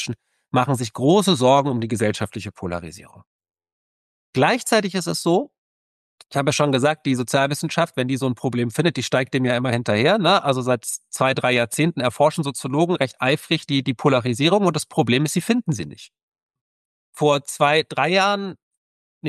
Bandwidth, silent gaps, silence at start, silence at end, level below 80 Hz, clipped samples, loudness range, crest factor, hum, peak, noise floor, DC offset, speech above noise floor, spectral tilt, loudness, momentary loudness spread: 12.5 kHz; 3.27-3.39 s, 3.72-4.33 s, 5.58-6.18 s, 16.23-16.32 s, 16.43-16.49 s, 16.61-17.13 s, 18.62-18.71 s, 18.77-19.21 s; 0 s; 0 s; -56 dBFS; under 0.1%; 4 LU; 16 dB; none; -4 dBFS; under -90 dBFS; under 0.1%; over 70 dB; -5 dB/octave; -20 LUFS; 10 LU